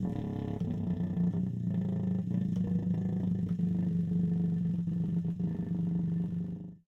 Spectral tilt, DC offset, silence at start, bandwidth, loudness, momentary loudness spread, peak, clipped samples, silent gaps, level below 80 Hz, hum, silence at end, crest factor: -11 dB/octave; under 0.1%; 0 s; 3.7 kHz; -33 LUFS; 4 LU; -20 dBFS; under 0.1%; none; -56 dBFS; none; 0.1 s; 10 dB